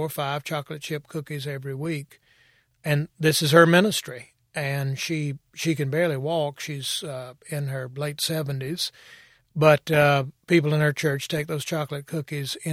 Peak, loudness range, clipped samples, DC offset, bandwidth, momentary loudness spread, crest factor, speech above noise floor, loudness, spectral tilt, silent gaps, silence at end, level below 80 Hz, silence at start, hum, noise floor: -2 dBFS; 6 LU; under 0.1%; under 0.1%; 16 kHz; 14 LU; 22 dB; 37 dB; -24 LUFS; -5 dB/octave; none; 0 s; -64 dBFS; 0 s; none; -62 dBFS